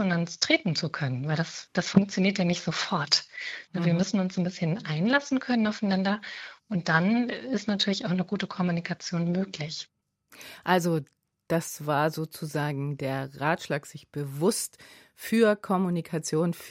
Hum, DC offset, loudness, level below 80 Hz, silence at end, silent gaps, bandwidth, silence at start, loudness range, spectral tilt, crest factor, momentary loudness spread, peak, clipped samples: none; under 0.1%; -28 LUFS; -68 dBFS; 0 s; none; 16 kHz; 0 s; 4 LU; -5 dB/octave; 22 dB; 11 LU; -4 dBFS; under 0.1%